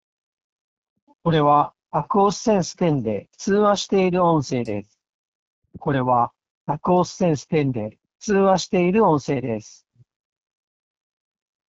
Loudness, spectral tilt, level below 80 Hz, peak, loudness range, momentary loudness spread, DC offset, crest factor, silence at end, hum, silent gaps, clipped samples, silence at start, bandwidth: -21 LUFS; -6 dB/octave; -54 dBFS; -6 dBFS; 3 LU; 12 LU; under 0.1%; 16 dB; 2 s; none; 5.09-5.62 s, 6.50-6.67 s; under 0.1%; 1.25 s; 8 kHz